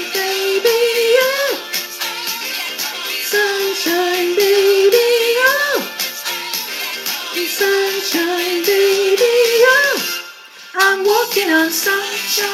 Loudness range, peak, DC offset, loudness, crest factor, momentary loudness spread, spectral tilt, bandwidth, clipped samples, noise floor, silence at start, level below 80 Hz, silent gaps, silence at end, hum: 3 LU; 0 dBFS; under 0.1%; -15 LUFS; 16 dB; 9 LU; -0.5 dB/octave; 17 kHz; under 0.1%; -36 dBFS; 0 s; -88 dBFS; none; 0 s; none